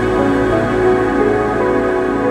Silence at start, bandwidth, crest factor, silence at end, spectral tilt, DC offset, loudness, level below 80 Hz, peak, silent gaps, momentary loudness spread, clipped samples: 0 s; 11 kHz; 12 dB; 0 s; -7 dB/octave; under 0.1%; -15 LUFS; -32 dBFS; -2 dBFS; none; 2 LU; under 0.1%